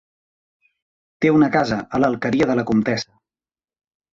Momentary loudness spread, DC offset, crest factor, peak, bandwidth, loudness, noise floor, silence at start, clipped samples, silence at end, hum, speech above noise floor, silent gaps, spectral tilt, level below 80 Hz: 7 LU; under 0.1%; 18 dB; -4 dBFS; 7.6 kHz; -19 LUFS; under -90 dBFS; 1.2 s; under 0.1%; 1.1 s; none; over 72 dB; none; -6.5 dB/octave; -52 dBFS